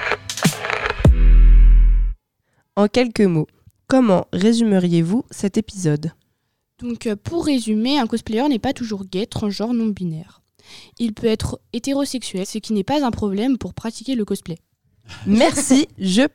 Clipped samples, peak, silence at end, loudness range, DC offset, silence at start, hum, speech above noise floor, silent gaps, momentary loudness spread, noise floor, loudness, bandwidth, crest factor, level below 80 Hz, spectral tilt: under 0.1%; -2 dBFS; 0.05 s; 6 LU; 0.3%; 0 s; none; 52 dB; none; 12 LU; -71 dBFS; -19 LUFS; 13.5 kHz; 16 dB; -22 dBFS; -5.5 dB/octave